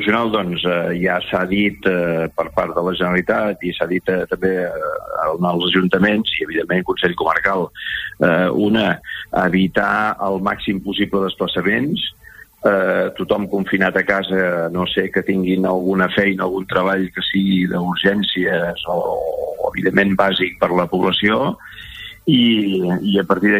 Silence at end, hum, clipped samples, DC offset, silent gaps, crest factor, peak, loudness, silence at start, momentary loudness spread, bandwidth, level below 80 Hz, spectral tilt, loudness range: 0 s; none; under 0.1%; under 0.1%; none; 18 dB; 0 dBFS; -18 LUFS; 0 s; 6 LU; 16 kHz; -48 dBFS; -7 dB/octave; 2 LU